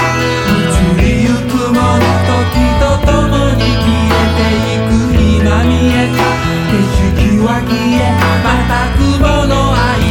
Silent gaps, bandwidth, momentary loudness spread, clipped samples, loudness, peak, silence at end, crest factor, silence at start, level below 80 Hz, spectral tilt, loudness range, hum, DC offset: none; 17.5 kHz; 2 LU; under 0.1%; -11 LUFS; 0 dBFS; 0 s; 10 dB; 0 s; -18 dBFS; -6 dB/octave; 0 LU; none; under 0.1%